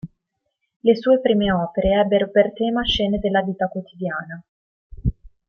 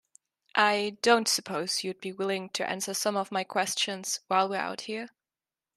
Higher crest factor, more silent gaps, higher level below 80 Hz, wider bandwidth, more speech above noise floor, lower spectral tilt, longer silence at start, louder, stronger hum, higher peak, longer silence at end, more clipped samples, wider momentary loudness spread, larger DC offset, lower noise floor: about the same, 18 dB vs 22 dB; first, 0.76-0.80 s, 4.48-4.90 s vs none; first, -38 dBFS vs -78 dBFS; second, 6.8 kHz vs 14 kHz; second, 57 dB vs over 61 dB; first, -7 dB/octave vs -2 dB/octave; second, 0.05 s vs 0.55 s; first, -20 LUFS vs -28 LUFS; neither; first, -4 dBFS vs -8 dBFS; second, 0.2 s vs 0.7 s; neither; about the same, 11 LU vs 10 LU; neither; second, -76 dBFS vs under -90 dBFS